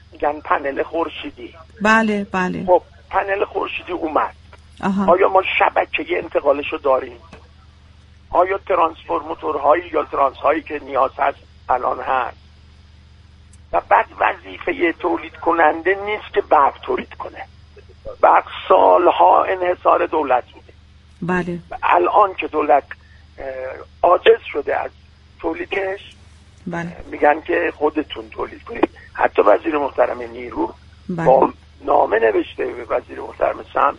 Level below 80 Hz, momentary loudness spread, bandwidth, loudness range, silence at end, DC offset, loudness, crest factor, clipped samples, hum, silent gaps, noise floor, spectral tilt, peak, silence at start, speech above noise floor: -46 dBFS; 15 LU; 9.8 kHz; 6 LU; 0 s; under 0.1%; -18 LUFS; 18 dB; under 0.1%; none; none; -46 dBFS; -6.5 dB/octave; 0 dBFS; 0.2 s; 29 dB